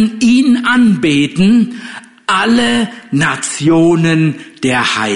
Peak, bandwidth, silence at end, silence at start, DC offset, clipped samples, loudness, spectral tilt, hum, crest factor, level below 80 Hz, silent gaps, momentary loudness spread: -2 dBFS; 11 kHz; 0 s; 0 s; under 0.1%; under 0.1%; -12 LUFS; -5 dB/octave; none; 10 dB; -48 dBFS; none; 8 LU